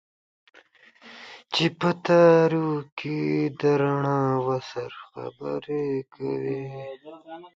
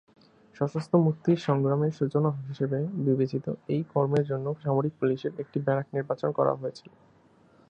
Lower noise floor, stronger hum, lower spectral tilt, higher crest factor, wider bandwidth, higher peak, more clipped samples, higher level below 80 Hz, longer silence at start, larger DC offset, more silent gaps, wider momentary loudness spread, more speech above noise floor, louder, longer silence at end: second, -55 dBFS vs -59 dBFS; neither; second, -7 dB/octave vs -9 dB/octave; about the same, 20 dB vs 20 dB; about the same, 7.8 kHz vs 8 kHz; first, -4 dBFS vs -8 dBFS; neither; about the same, -68 dBFS vs -70 dBFS; first, 1.05 s vs 0.55 s; neither; first, 2.92-2.97 s vs none; first, 21 LU vs 7 LU; about the same, 31 dB vs 32 dB; first, -24 LUFS vs -28 LUFS; second, 0.1 s vs 0.9 s